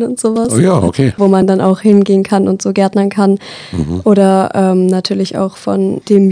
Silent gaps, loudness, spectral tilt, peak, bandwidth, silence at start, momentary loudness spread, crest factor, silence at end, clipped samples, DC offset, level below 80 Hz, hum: none; -12 LUFS; -6.5 dB/octave; 0 dBFS; 10 kHz; 0 s; 7 LU; 10 dB; 0 s; 0.5%; under 0.1%; -42 dBFS; none